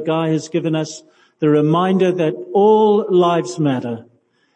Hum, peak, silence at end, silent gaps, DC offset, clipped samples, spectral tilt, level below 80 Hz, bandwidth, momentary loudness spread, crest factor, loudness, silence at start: none; -4 dBFS; 0.55 s; none; under 0.1%; under 0.1%; -7 dB/octave; -70 dBFS; 9.4 kHz; 11 LU; 14 dB; -16 LUFS; 0 s